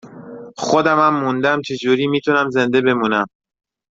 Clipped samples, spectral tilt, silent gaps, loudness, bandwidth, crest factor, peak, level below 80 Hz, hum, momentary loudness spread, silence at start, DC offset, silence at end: under 0.1%; -5.5 dB/octave; none; -17 LUFS; 7.8 kHz; 16 dB; -2 dBFS; -60 dBFS; none; 13 LU; 0.05 s; under 0.1%; 0.65 s